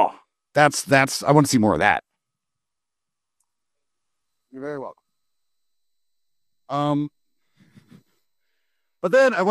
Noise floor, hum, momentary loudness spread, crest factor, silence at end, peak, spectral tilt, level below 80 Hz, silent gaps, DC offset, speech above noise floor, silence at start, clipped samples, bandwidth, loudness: -86 dBFS; none; 16 LU; 22 dB; 0 s; -2 dBFS; -5 dB/octave; -58 dBFS; none; under 0.1%; 67 dB; 0 s; under 0.1%; 14 kHz; -19 LUFS